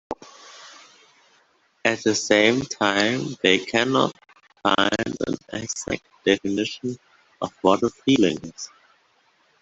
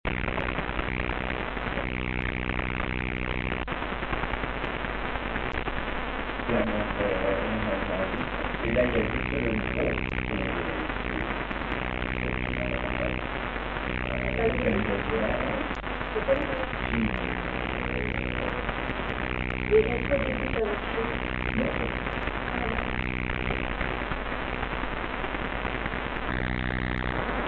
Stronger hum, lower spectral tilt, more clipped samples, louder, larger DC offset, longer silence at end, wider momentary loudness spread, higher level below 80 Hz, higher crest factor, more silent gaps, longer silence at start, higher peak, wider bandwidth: neither; second, -3.5 dB/octave vs -8.5 dB/octave; neither; first, -22 LUFS vs -29 LUFS; second, under 0.1% vs 0.2%; first, 0.95 s vs 0 s; first, 18 LU vs 5 LU; second, -58 dBFS vs -36 dBFS; about the same, 22 dB vs 20 dB; neither; about the same, 0.1 s vs 0.05 s; first, -2 dBFS vs -10 dBFS; first, 8.2 kHz vs 4.5 kHz